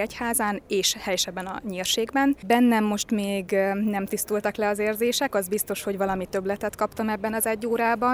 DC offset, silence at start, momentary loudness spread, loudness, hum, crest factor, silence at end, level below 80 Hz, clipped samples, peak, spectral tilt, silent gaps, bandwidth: under 0.1%; 0 s; 6 LU; -25 LUFS; none; 18 dB; 0 s; -54 dBFS; under 0.1%; -8 dBFS; -3.5 dB/octave; none; over 20 kHz